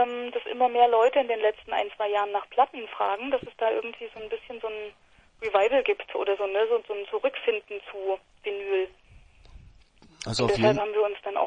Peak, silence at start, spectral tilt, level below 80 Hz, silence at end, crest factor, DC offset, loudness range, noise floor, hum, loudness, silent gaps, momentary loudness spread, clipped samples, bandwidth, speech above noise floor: -8 dBFS; 0 s; -5 dB/octave; -58 dBFS; 0 s; 18 dB; under 0.1%; 6 LU; -55 dBFS; none; -27 LUFS; none; 14 LU; under 0.1%; 10 kHz; 29 dB